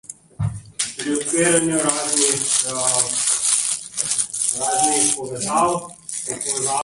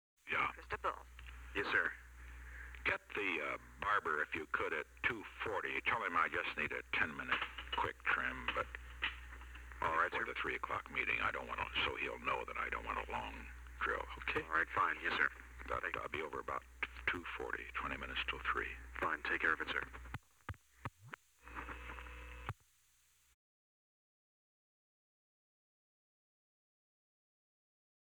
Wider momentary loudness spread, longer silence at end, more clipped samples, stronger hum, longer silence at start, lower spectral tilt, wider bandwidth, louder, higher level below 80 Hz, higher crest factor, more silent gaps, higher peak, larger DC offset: second, 11 LU vs 16 LU; second, 0 s vs 5.6 s; neither; neither; second, 0.1 s vs 0.25 s; second, -2 dB/octave vs -4 dB/octave; second, 12 kHz vs over 20 kHz; first, -19 LUFS vs -39 LUFS; first, -50 dBFS vs -58 dBFS; about the same, 20 dB vs 22 dB; neither; first, 0 dBFS vs -20 dBFS; neither